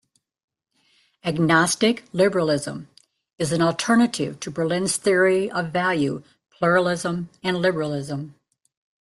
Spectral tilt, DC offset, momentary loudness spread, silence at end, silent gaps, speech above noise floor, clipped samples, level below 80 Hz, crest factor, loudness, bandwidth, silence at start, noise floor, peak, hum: -4.5 dB/octave; under 0.1%; 11 LU; 0.7 s; none; 44 dB; under 0.1%; -60 dBFS; 20 dB; -22 LUFS; 12.5 kHz; 1.25 s; -65 dBFS; -4 dBFS; none